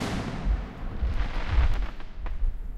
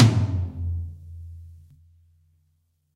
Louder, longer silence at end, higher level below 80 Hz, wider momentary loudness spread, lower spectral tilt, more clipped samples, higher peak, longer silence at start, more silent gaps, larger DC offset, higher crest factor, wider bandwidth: second, -32 LUFS vs -26 LUFS; second, 0 s vs 1.45 s; first, -28 dBFS vs -42 dBFS; second, 11 LU vs 22 LU; about the same, -6.5 dB/octave vs -7 dB/octave; neither; second, -12 dBFS vs -2 dBFS; about the same, 0 s vs 0 s; neither; neither; second, 16 dB vs 24 dB; about the same, 10 kHz vs 10 kHz